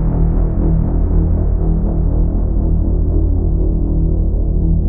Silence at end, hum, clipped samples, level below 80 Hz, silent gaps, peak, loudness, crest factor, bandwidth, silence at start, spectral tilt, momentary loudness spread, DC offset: 0 s; none; under 0.1%; -14 dBFS; none; -2 dBFS; -17 LUFS; 12 dB; 1.7 kHz; 0 s; -16 dB/octave; 1 LU; 0.4%